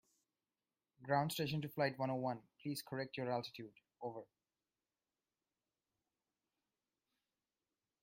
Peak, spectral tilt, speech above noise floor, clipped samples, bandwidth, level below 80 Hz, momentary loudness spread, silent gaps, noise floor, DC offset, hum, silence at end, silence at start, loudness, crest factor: -22 dBFS; -5.5 dB/octave; over 49 dB; under 0.1%; 15.5 kHz; -82 dBFS; 15 LU; none; under -90 dBFS; under 0.1%; none; 3.8 s; 1 s; -42 LUFS; 24 dB